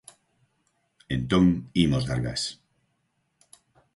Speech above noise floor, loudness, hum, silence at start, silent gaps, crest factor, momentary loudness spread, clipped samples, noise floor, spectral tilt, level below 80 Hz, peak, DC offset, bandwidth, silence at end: 50 dB; -25 LUFS; none; 1.1 s; none; 20 dB; 10 LU; under 0.1%; -74 dBFS; -6 dB/octave; -46 dBFS; -8 dBFS; under 0.1%; 11.5 kHz; 1.4 s